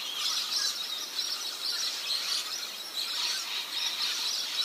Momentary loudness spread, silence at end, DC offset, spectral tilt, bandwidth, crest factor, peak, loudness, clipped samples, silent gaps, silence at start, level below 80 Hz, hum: 4 LU; 0 s; under 0.1%; 3 dB/octave; 15.5 kHz; 16 dB; -16 dBFS; -30 LUFS; under 0.1%; none; 0 s; under -90 dBFS; none